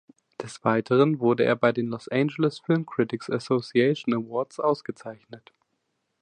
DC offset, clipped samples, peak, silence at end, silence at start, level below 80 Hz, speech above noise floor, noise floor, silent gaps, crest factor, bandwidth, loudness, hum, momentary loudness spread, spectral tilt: under 0.1%; under 0.1%; -6 dBFS; 0.85 s; 0.4 s; -70 dBFS; 52 dB; -76 dBFS; none; 18 dB; 10 kHz; -25 LUFS; none; 16 LU; -7 dB/octave